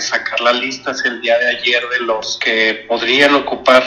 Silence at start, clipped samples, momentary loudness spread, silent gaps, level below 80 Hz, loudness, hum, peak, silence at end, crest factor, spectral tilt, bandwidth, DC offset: 0 s; 0.2%; 7 LU; none; -56 dBFS; -14 LUFS; none; 0 dBFS; 0 s; 14 dB; -2 dB/octave; 12 kHz; under 0.1%